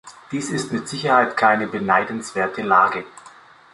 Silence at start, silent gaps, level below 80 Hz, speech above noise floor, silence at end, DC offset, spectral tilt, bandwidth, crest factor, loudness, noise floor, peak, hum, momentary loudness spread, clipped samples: 0.05 s; none; -62 dBFS; 27 dB; 0.45 s; under 0.1%; -4.5 dB/octave; 11.5 kHz; 20 dB; -20 LUFS; -46 dBFS; -2 dBFS; none; 12 LU; under 0.1%